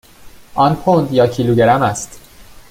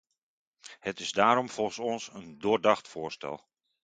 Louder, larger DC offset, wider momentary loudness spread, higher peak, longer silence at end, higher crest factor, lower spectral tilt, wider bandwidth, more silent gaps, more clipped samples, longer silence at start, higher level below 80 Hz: first, -14 LUFS vs -29 LUFS; neither; about the same, 14 LU vs 16 LU; first, -2 dBFS vs -6 dBFS; second, 0.1 s vs 0.45 s; second, 14 dB vs 24 dB; first, -6 dB/octave vs -4 dB/octave; first, 16.5 kHz vs 9.4 kHz; neither; neither; second, 0.25 s vs 0.65 s; first, -44 dBFS vs -70 dBFS